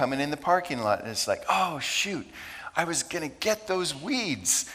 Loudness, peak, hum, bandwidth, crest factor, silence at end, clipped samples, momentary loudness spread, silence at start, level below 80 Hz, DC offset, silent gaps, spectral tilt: -27 LUFS; -8 dBFS; none; 16.5 kHz; 20 dB; 0 s; under 0.1%; 6 LU; 0 s; -62 dBFS; under 0.1%; none; -2.5 dB/octave